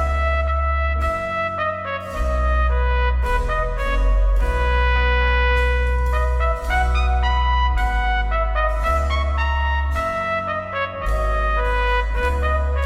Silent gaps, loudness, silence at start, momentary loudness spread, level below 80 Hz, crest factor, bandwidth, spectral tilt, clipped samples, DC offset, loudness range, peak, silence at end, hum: none; -21 LUFS; 0 s; 5 LU; -20 dBFS; 12 dB; 9 kHz; -6 dB/octave; under 0.1%; under 0.1%; 2 LU; -6 dBFS; 0 s; none